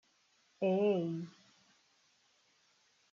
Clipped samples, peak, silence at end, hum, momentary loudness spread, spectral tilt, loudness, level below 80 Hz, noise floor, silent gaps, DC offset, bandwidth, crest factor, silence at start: under 0.1%; -22 dBFS; 1.8 s; none; 14 LU; -7 dB/octave; -34 LUFS; -88 dBFS; -73 dBFS; none; under 0.1%; 7.2 kHz; 18 dB; 0.6 s